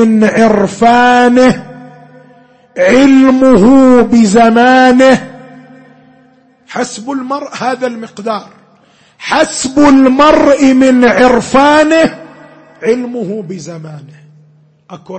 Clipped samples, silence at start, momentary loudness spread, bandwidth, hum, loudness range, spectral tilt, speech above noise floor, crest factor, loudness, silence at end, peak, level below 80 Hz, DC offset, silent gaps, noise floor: 0.1%; 0 s; 16 LU; 8.8 kHz; none; 13 LU; -5 dB/octave; 39 dB; 10 dB; -8 LUFS; 0 s; 0 dBFS; -40 dBFS; under 0.1%; none; -47 dBFS